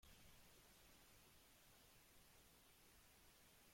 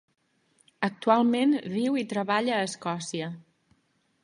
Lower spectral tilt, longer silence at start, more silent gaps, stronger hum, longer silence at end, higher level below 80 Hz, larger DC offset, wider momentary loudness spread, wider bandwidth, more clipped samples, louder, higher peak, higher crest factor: second, -2.5 dB/octave vs -5 dB/octave; second, 0 s vs 0.8 s; neither; neither; second, 0 s vs 0.85 s; about the same, -78 dBFS vs -76 dBFS; neither; second, 2 LU vs 11 LU; first, 16.5 kHz vs 11 kHz; neither; second, -69 LUFS vs -27 LUFS; second, -56 dBFS vs -8 dBFS; second, 14 dB vs 20 dB